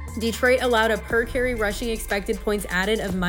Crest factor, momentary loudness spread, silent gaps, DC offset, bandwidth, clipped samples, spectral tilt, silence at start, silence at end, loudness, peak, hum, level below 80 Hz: 16 dB; 6 LU; none; under 0.1%; 19 kHz; under 0.1%; -4.5 dB/octave; 0 s; 0 s; -23 LUFS; -6 dBFS; none; -36 dBFS